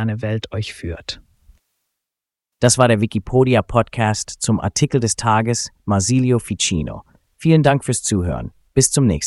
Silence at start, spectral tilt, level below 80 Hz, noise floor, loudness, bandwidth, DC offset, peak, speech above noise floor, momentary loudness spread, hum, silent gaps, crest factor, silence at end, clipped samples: 0 s; -5 dB/octave; -40 dBFS; -86 dBFS; -18 LUFS; 12 kHz; under 0.1%; 0 dBFS; 69 dB; 13 LU; none; none; 18 dB; 0 s; under 0.1%